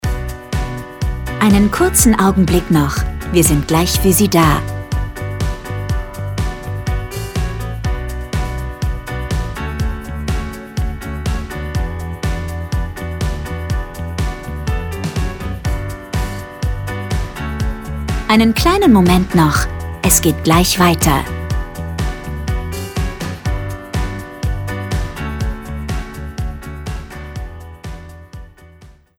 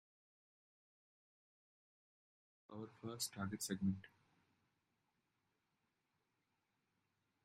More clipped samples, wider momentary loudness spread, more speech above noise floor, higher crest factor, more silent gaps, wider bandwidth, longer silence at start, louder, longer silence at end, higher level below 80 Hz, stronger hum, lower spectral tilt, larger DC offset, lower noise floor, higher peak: neither; about the same, 14 LU vs 13 LU; second, 31 dB vs 42 dB; second, 18 dB vs 24 dB; neither; first, 18 kHz vs 11 kHz; second, 0.05 s vs 2.7 s; first, -18 LUFS vs -45 LUFS; second, 0.25 s vs 3.4 s; first, -24 dBFS vs -82 dBFS; neither; about the same, -5 dB/octave vs -4.5 dB/octave; neither; second, -43 dBFS vs -87 dBFS; first, 0 dBFS vs -28 dBFS